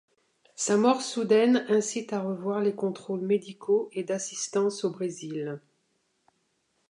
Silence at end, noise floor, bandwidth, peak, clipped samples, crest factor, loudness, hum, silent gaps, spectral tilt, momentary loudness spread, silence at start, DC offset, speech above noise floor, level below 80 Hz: 1.3 s; -74 dBFS; 11 kHz; -8 dBFS; under 0.1%; 20 dB; -27 LUFS; none; none; -4.5 dB/octave; 11 LU; 0.6 s; under 0.1%; 47 dB; -82 dBFS